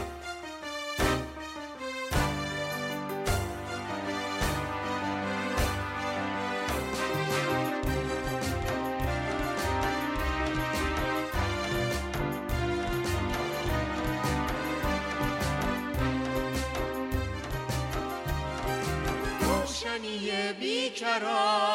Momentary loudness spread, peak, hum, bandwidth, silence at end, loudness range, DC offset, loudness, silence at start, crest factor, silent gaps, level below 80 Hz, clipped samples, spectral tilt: 5 LU; -14 dBFS; none; 16.5 kHz; 0 s; 2 LU; under 0.1%; -31 LUFS; 0 s; 16 dB; none; -40 dBFS; under 0.1%; -4.5 dB/octave